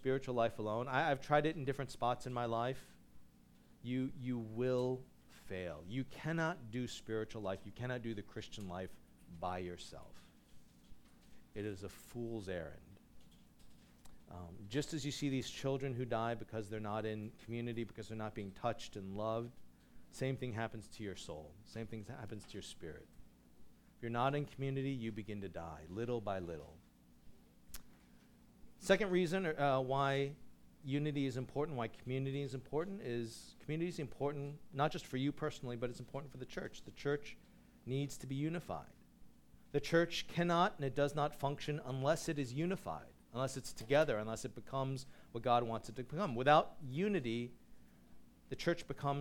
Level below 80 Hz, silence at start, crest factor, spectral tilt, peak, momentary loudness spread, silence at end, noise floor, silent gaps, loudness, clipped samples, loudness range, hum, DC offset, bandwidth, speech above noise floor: -64 dBFS; 0 s; 24 dB; -6 dB/octave; -16 dBFS; 15 LU; 0 s; -65 dBFS; none; -40 LUFS; under 0.1%; 11 LU; 60 Hz at -70 dBFS; under 0.1%; 18 kHz; 26 dB